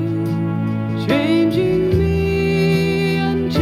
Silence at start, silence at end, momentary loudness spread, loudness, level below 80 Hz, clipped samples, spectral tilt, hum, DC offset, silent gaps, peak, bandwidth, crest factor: 0 s; 0 s; 5 LU; -18 LUFS; -34 dBFS; under 0.1%; -7.5 dB/octave; none; under 0.1%; none; -4 dBFS; 14 kHz; 14 dB